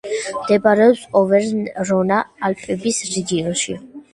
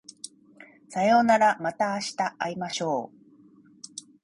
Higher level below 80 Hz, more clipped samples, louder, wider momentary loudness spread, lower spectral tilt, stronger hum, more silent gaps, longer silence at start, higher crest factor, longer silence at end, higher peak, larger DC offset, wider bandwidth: first, -56 dBFS vs -70 dBFS; neither; first, -18 LUFS vs -25 LUFS; second, 10 LU vs 23 LU; about the same, -4.5 dB/octave vs -4 dB/octave; neither; neither; second, 0.05 s vs 0.9 s; about the same, 18 dB vs 18 dB; second, 0.1 s vs 0.25 s; first, 0 dBFS vs -8 dBFS; neither; about the same, 11.5 kHz vs 11.5 kHz